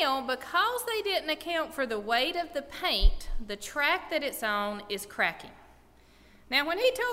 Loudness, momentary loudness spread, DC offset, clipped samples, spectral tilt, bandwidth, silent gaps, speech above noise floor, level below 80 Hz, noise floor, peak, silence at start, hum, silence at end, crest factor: -29 LUFS; 9 LU; under 0.1%; under 0.1%; -3 dB/octave; 16 kHz; none; 29 dB; -36 dBFS; -58 dBFS; -10 dBFS; 0 s; none; 0 s; 20 dB